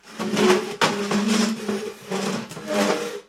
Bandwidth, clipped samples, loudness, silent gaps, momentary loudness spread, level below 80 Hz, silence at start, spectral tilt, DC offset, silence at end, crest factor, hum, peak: 16 kHz; under 0.1%; -23 LUFS; none; 9 LU; -62 dBFS; 0.05 s; -4 dB/octave; under 0.1%; 0.05 s; 20 dB; none; -4 dBFS